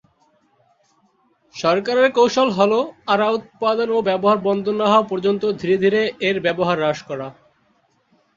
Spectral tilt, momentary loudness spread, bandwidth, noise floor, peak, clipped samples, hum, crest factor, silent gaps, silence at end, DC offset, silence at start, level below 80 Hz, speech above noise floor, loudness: -5.5 dB/octave; 6 LU; 7.6 kHz; -62 dBFS; -2 dBFS; under 0.1%; none; 18 dB; none; 1.05 s; under 0.1%; 1.55 s; -62 dBFS; 44 dB; -18 LUFS